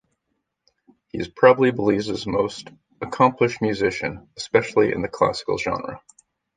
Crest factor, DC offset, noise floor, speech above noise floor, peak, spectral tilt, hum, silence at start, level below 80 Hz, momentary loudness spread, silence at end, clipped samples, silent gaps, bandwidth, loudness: 20 dB; under 0.1%; -76 dBFS; 55 dB; -2 dBFS; -5.5 dB/octave; none; 1.15 s; -52 dBFS; 17 LU; 0.6 s; under 0.1%; none; 9.4 kHz; -21 LUFS